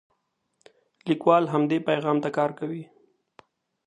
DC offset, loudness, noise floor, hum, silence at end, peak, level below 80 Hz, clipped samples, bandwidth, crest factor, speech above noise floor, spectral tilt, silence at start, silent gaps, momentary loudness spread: under 0.1%; -24 LUFS; -75 dBFS; none; 1.05 s; -6 dBFS; -76 dBFS; under 0.1%; 9.8 kHz; 22 dB; 51 dB; -7.5 dB/octave; 1.05 s; none; 14 LU